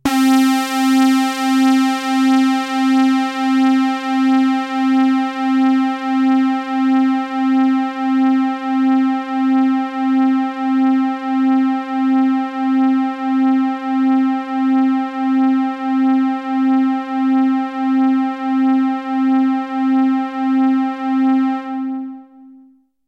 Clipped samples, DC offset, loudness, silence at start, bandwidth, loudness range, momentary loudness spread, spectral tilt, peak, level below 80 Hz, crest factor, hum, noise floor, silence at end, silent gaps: under 0.1%; under 0.1%; -16 LUFS; 0.05 s; 13.5 kHz; 2 LU; 5 LU; -3.5 dB/octave; -8 dBFS; -62 dBFS; 8 dB; none; -49 dBFS; 0.55 s; none